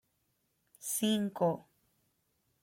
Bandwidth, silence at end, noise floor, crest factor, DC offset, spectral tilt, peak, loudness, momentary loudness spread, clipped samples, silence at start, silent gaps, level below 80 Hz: 16.5 kHz; 1 s; -78 dBFS; 18 dB; under 0.1%; -4.5 dB/octave; -18 dBFS; -33 LUFS; 12 LU; under 0.1%; 0.8 s; none; -78 dBFS